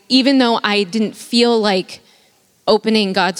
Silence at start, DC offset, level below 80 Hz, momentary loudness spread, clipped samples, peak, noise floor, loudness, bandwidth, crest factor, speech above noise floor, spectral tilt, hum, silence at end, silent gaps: 0.1 s; under 0.1%; -62 dBFS; 8 LU; under 0.1%; -2 dBFS; -55 dBFS; -15 LUFS; 15.5 kHz; 16 dB; 40 dB; -4.5 dB/octave; none; 0 s; none